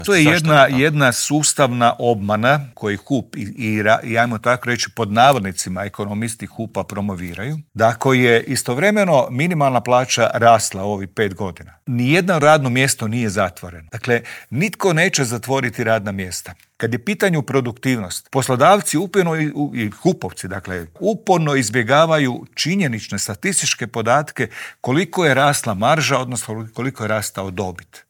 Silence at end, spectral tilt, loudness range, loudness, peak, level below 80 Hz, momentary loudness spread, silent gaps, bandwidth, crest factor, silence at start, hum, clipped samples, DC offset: 0.1 s; -4.5 dB/octave; 4 LU; -17 LUFS; 0 dBFS; -58 dBFS; 13 LU; none; over 20 kHz; 18 dB; 0 s; none; under 0.1%; under 0.1%